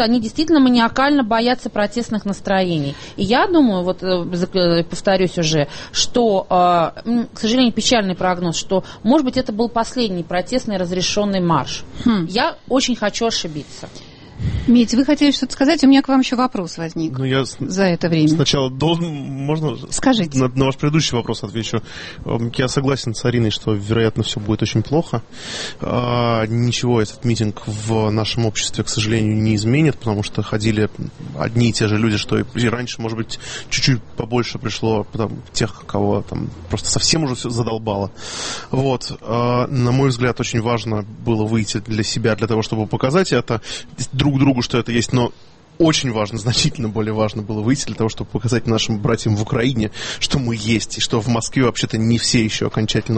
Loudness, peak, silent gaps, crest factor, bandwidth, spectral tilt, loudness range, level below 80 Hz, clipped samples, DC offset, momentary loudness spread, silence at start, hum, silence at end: -18 LUFS; -2 dBFS; none; 16 dB; 8.8 kHz; -5 dB/octave; 3 LU; -40 dBFS; under 0.1%; under 0.1%; 9 LU; 0 s; none; 0 s